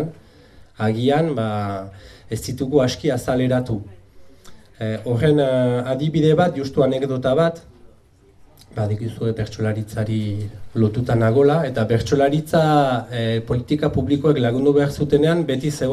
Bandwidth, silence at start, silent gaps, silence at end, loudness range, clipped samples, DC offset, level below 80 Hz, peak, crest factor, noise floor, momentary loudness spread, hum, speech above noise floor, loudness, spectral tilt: 14 kHz; 0 s; none; 0 s; 5 LU; under 0.1%; under 0.1%; -46 dBFS; -2 dBFS; 16 dB; -52 dBFS; 11 LU; none; 33 dB; -20 LUFS; -7 dB/octave